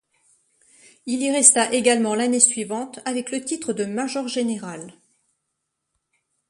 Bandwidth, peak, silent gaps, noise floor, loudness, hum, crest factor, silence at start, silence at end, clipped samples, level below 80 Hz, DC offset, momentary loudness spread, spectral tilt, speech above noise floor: 11.5 kHz; 0 dBFS; none; -78 dBFS; -20 LUFS; none; 24 dB; 1.05 s; 1.6 s; under 0.1%; -70 dBFS; under 0.1%; 15 LU; -2 dB/octave; 57 dB